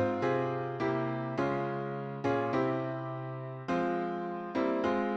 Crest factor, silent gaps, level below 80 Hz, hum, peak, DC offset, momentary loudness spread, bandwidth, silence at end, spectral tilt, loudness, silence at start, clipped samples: 14 dB; none; -68 dBFS; none; -18 dBFS; under 0.1%; 7 LU; 8 kHz; 0 s; -8 dB/octave; -33 LUFS; 0 s; under 0.1%